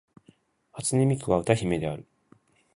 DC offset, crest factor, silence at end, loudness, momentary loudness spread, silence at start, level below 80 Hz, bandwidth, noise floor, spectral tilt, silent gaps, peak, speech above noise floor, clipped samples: under 0.1%; 24 dB; 0.75 s; -26 LUFS; 13 LU; 0.75 s; -52 dBFS; 11.5 kHz; -61 dBFS; -6 dB/octave; none; -4 dBFS; 36 dB; under 0.1%